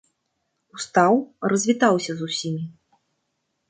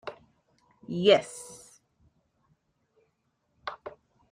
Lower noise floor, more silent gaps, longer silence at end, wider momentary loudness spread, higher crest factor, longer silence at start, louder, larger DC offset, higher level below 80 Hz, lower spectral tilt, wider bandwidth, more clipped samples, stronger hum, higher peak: about the same, -75 dBFS vs -75 dBFS; neither; first, 1 s vs 0.4 s; second, 13 LU vs 24 LU; about the same, 20 dB vs 24 dB; first, 0.75 s vs 0.05 s; first, -22 LUFS vs -26 LUFS; neither; about the same, -70 dBFS vs -72 dBFS; about the same, -4.5 dB/octave vs -4.5 dB/octave; second, 9.6 kHz vs 14.5 kHz; neither; neither; first, -4 dBFS vs -8 dBFS